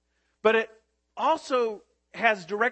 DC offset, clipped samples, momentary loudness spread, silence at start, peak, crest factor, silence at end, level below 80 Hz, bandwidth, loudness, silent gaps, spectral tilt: under 0.1%; under 0.1%; 19 LU; 0.45 s; -6 dBFS; 20 dB; 0 s; -74 dBFS; 8.6 kHz; -26 LUFS; none; -4 dB/octave